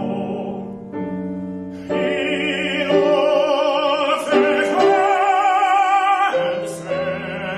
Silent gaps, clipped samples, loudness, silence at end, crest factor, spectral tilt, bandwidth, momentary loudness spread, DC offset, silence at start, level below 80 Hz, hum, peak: none; under 0.1%; -18 LUFS; 0 s; 16 dB; -5 dB/octave; 12.5 kHz; 12 LU; under 0.1%; 0 s; -58 dBFS; none; -4 dBFS